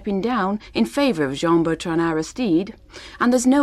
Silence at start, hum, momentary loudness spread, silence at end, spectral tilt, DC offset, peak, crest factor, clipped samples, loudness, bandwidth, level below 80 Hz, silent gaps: 0 s; none; 5 LU; 0 s; -5 dB/octave; under 0.1%; -6 dBFS; 14 dB; under 0.1%; -21 LUFS; 13.5 kHz; -48 dBFS; none